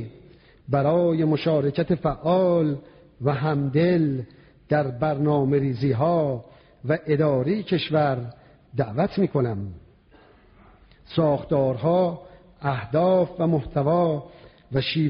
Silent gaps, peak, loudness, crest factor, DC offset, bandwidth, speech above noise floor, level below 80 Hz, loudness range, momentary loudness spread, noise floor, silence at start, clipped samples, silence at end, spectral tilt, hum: none; -8 dBFS; -23 LUFS; 16 dB; under 0.1%; 5.4 kHz; 32 dB; -52 dBFS; 4 LU; 10 LU; -54 dBFS; 0 s; under 0.1%; 0 s; -6.5 dB/octave; none